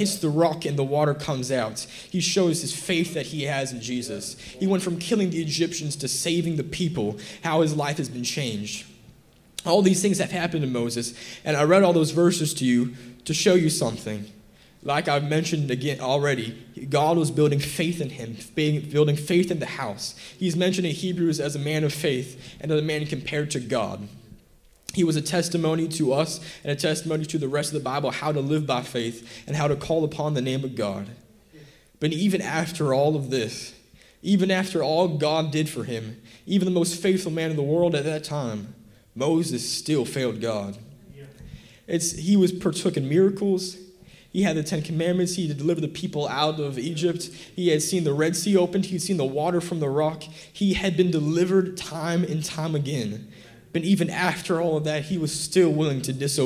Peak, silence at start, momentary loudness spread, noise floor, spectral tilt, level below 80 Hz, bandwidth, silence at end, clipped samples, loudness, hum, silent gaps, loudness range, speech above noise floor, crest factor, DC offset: -6 dBFS; 0 s; 11 LU; -56 dBFS; -5 dB/octave; -56 dBFS; 16 kHz; 0 s; under 0.1%; -24 LUFS; none; none; 4 LU; 32 dB; 18 dB; under 0.1%